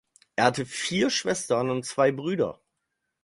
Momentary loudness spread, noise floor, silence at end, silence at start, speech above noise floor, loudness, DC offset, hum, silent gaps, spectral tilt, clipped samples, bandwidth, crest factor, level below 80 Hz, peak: 5 LU; -80 dBFS; 0.7 s; 0.4 s; 55 dB; -26 LUFS; under 0.1%; none; none; -4 dB/octave; under 0.1%; 11.5 kHz; 22 dB; -64 dBFS; -4 dBFS